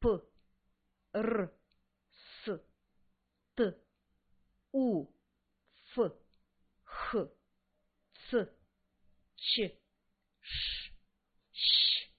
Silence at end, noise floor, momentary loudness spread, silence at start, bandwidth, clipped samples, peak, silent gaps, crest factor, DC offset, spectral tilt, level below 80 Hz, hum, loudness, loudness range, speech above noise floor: 0.15 s; -80 dBFS; 18 LU; 0 s; 4.8 kHz; under 0.1%; -16 dBFS; none; 22 dB; under 0.1%; -2 dB/octave; -58 dBFS; none; -34 LUFS; 4 LU; 47 dB